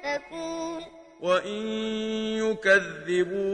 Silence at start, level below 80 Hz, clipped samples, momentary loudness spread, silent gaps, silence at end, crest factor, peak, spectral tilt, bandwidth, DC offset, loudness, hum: 0 s; -64 dBFS; under 0.1%; 13 LU; none; 0 s; 20 dB; -8 dBFS; -4 dB/octave; 10 kHz; under 0.1%; -27 LUFS; none